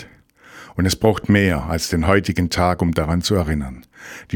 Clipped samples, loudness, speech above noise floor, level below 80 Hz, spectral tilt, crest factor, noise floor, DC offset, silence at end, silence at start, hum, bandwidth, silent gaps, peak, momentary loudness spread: under 0.1%; -19 LUFS; 29 dB; -36 dBFS; -5.5 dB/octave; 20 dB; -48 dBFS; under 0.1%; 0 s; 0 s; none; 18 kHz; none; 0 dBFS; 16 LU